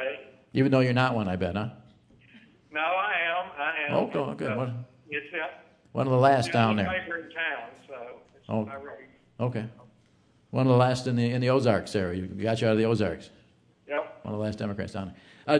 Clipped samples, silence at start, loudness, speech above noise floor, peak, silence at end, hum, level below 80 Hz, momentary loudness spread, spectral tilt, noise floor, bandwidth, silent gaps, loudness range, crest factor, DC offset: under 0.1%; 0 s; -27 LUFS; 36 dB; -6 dBFS; 0 s; none; -62 dBFS; 17 LU; -7 dB/octave; -63 dBFS; 10.5 kHz; none; 5 LU; 22 dB; under 0.1%